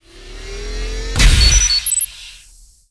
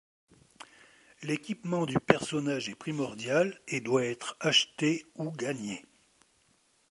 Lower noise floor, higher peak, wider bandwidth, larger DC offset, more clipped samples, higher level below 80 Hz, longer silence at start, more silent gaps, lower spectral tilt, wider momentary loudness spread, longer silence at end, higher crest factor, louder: second, -45 dBFS vs -69 dBFS; about the same, 0 dBFS vs -2 dBFS; about the same, 11 kHz vs 11.5 kHz; neither; neither; first, -18 dBFS vs -68 dBFS; second, 0.15 s vs 0.6 s; neither; second, -1.5 dB/octave vs -4 dB/octave; first, 23 LU vs 15 LU; second, 0.55 s vs 1.1 s; second, 16 dB vs 30 dB; first, -13 LUFS vs -30 LUFS